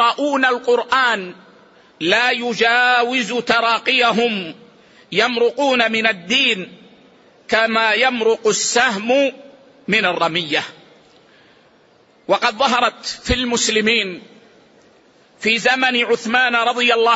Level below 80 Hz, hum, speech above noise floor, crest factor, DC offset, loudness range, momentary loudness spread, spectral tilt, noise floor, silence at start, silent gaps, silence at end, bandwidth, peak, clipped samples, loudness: -46 dBFS; none; 36 dB; 16 dB; under 0.1%; 4 LU; 8 LU; -2.5 dB/octave; -53 dBFS; 0 s; none; 0 s; 8 kHz; -2 dBFS; under 0.1%; -16 LUFS